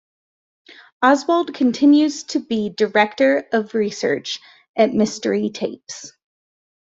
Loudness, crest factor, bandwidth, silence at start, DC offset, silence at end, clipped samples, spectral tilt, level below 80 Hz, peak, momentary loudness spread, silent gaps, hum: -19 LUFS; 18 dB; 7.8 kHz; 1 s; under 0.1%; 0.8 s; under 0.1%; -4.5 dB/octave; -64 dBFS; -2 dBFS; 14 LU; 4.69-4.74 s; none